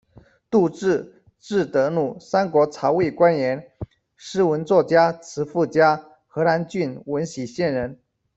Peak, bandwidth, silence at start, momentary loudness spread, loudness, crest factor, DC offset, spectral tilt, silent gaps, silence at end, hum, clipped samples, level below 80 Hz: -4 dBFS; 8 kHz; 0.5 s; 12 LU; -21 LUFS; 18 dB; under 0.1%; -6.5 dB/octave; none; 0.45 s; none; under 0.1%; -58 dBFS